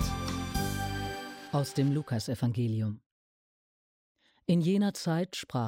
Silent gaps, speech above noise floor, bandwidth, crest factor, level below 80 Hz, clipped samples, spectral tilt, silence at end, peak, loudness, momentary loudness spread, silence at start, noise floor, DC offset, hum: 3.06-4.15 s; over 61 dB; 17 kHz; 16 dB; -48 dBFS; under 0.1%; -6 dB/octave; 0 s; -16 dBFS; -32 LUFS; 9 LU; 0 s; under -90 dBFS; under 0.1%; none